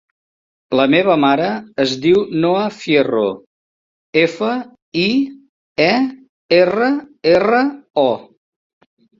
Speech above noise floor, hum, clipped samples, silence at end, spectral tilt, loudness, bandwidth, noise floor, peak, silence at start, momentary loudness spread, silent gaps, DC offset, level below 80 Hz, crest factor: over 75 dB; none; under 0.1%; 0.95 s; -6 dB/octave; -16 LUFS; 7.6 kHz; under -90 dBFS; -2 dBFS; 0.7 s; 9 LU; 3.46-4.13 s, 4.82-4.92 s, 5.49-5.75 s, 6.29-6.49 s, 7.90-7.94 s; under 0.1%; -58 dBFS; 16 dB